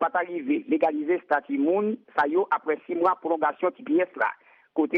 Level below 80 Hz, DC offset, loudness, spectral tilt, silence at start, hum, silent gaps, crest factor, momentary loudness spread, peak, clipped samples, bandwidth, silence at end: -74 dBFS; under 0.1%; -26 LUFS; -8 dB/octave; 0 s; none; none; 16 dB; 5 LU; -10 dBFS; under 0.1%; 5.2 kHz; 0 s